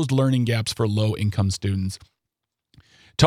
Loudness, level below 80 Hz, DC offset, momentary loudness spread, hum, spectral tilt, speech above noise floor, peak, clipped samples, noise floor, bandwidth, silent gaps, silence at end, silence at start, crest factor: -23 LUFS; -50 dBFS; under 0.1%; 11 LU; none; -6 dB/octave; 61 dB; -2 dBFS; under 0.1%; -83 dBFS; 15 kHz; none; 0 s; 0 s; 20 dB